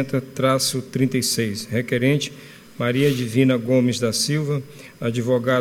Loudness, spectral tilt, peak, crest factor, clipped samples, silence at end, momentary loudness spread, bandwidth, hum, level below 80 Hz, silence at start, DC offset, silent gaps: -21 LUFS; -5 dB/octave; -4 dBFS; 16 dB; under 0.1%; 0 s; 9 LU; 19 kHz; none; -60 dBFS; 0 s; under 0.1%; none